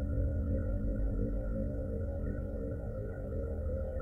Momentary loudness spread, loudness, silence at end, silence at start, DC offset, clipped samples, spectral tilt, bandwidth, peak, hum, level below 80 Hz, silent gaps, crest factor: 5 LU; -37 LUFS; 0 s; 0 s; under 0.1%; under 0.1%; -11.5 dB/octave; 2.1 kHz; -22 dBFS; none; -38 dBFS; none; 12 dB